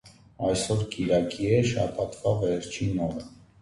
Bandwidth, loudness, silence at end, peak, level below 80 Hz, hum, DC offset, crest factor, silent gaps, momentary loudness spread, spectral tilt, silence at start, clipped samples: 11.5 kHz; -27 LUFS; 0.25 s; -10 dBFS; -50 dBFS; none; under 0.1%; 18 dB; none; 7 LU; -6 dB/octave; 0.05 s; under 0.1%